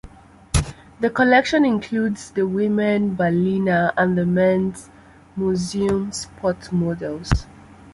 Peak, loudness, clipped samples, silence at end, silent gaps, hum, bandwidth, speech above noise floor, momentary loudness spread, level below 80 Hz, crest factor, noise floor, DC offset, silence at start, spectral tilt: -2 dBFS; -20 LUFS; under 0.1%; 0.05 s; none; none; 11.5 kHz; 24 dB; 9 LU; -36 dBFS; 18 dB; -44 dBFS; under 0.1%; 0.05 s; -6 dB/octave